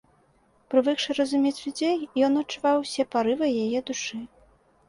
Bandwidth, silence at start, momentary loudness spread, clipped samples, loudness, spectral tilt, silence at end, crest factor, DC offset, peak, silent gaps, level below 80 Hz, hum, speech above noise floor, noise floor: 11.5 kHz; 0.7 s; 8 LU; under 0.1%; -25 LUFS; -3.5 dB/octave; 0.65 s; 18 dB; under 0.1%; -8 dBFS; none; -66 dBFS; none; 38 dB; -63 dBFS